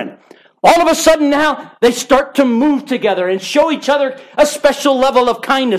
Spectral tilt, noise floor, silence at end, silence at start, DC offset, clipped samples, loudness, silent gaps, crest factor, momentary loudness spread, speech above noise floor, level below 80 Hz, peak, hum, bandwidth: -3 dB/octave; -44 dBFS; 0 s; 0 s; under 0.1%; under 0.1%; -13 LUFS; none; 12 dB; 5 LU; 32 dB; -46 dBFS; 0 dBFS; none; 15.5 kHz